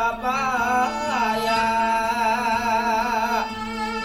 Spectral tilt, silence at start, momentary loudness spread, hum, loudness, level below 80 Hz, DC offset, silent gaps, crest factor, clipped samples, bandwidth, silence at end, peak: -3.5 dB/octave; 0 s; 4 LU; none; -22 LUFS; -46 dBFS; under 0.1%; none; 12 dB; under 0.1%; 16 kHz; 0 s; -10 dBFS